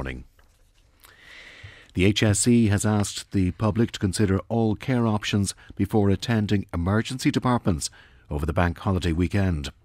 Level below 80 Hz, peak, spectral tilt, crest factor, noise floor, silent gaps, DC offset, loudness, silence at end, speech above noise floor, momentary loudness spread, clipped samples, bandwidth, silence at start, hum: -42 dBFS; -6 dBFS; -5.5 dB/octave; 18 dB; -59 dBFS; none; under 0.1%; -24 LUFS; 0.15 s; 36 dB; 12 LU; under 0.1%; 16 kHz; 0 s; none